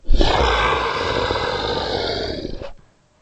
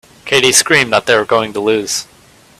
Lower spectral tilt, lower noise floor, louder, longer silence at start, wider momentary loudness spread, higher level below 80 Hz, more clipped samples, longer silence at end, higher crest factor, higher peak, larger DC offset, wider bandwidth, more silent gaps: first, -4.5 dB/octave vs -2 dB/octave; about the same, -45 dBFS vs -45 dBFS; second, -20 LUFS vs -12 LUFS; second, 0.05 s vs 0.25 s; first, 14 LU vs 8 LU; first, -24 dBFS vs -52 dBFS; neither; about the same, 0.45 s vs 0.55 s; about the same, 18 dB vs 14 dB; about the same, 0 dBFS vs 0 dBFS; neither; second, 8.4 kHz vs over 20 kHz; neither